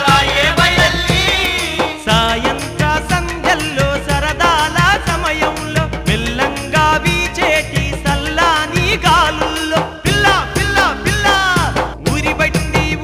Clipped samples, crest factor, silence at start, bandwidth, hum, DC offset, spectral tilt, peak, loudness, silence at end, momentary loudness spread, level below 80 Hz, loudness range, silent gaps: under 0.1%; 12 dB; 0 s; 19.5 kHz; none; under 0.1%; -4 dB/octave; -2 dBFS; -14 LUFS; 0 s; 6 LU; -26 dBFS; 2 LU; none